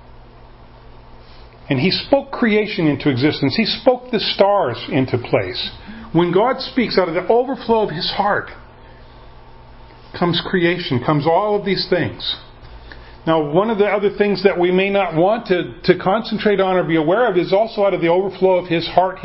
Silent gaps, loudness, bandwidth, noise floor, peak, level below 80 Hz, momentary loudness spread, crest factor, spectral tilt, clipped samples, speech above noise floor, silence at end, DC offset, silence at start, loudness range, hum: none; -17 LUFS; 5.8 kHz; -41 dBFS; 0 dBFS; -46 dBFS; 5 LU; 18 dB; -10.5 dB/octave; under 0.1%; 24 dB; 0 s; under 0.1%; 0.15 s; 4 LU; none